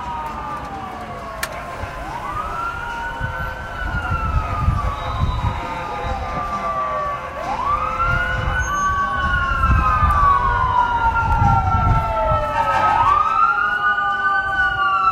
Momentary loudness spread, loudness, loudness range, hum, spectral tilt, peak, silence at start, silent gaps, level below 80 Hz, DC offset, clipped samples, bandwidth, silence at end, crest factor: 12 LU; -19 LUFS; 9 LU; none; -5.5 dB/octave; -4 dBFS; 0 s; none; -28 dBFS; under 0.1%; under 0.1%; 16 kHz; 0 s; 16 dB